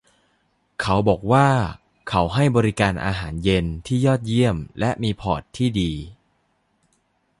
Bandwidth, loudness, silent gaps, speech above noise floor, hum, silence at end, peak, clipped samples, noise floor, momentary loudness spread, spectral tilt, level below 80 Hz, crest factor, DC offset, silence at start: 11.5 kHz; -21 LUFS; none; 47 dB; none; 1.25 s; -2 dBFS; under 0.1%; -67 dBFS; 9 LU; -6.5 dB/octave; -40 dBFS; 20 dB; under 0.1%; 0.8 s